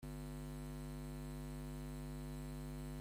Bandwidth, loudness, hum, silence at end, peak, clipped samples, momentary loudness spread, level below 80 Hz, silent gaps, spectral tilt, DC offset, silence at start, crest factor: 16 kHz; -49 LUFS; none; 0 s; -38 dBFS; under 0.1%; 0 LU; -52 dBFS; none; -6.5 dB/octave; under 0.1%; 0 s; 8 dB